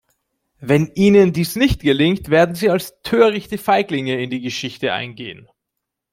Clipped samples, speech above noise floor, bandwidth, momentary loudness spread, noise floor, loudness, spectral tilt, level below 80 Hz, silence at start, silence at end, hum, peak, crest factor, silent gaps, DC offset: under 0.1%; 63 dB; 16.5 kHz; 11 LU; -80 dBFS; -17 LUFS; -6 dB/octave; -40 dBFS; 0.6 s; 0.8 s; none; -2 dBFS; 16 dB; none; under 0.1%